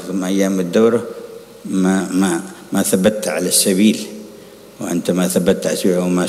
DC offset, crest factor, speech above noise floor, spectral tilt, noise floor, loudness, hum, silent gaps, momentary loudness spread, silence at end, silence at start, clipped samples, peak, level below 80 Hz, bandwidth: under 0.1%; 14 dB; 23 dB; -4.5 dB/octave; -39 dBFS; -16 LUFS; none; none; 16 LU; 0 s; 0 s; under 0.1%; -2 dBFS; -56 dBFS; 16 kHz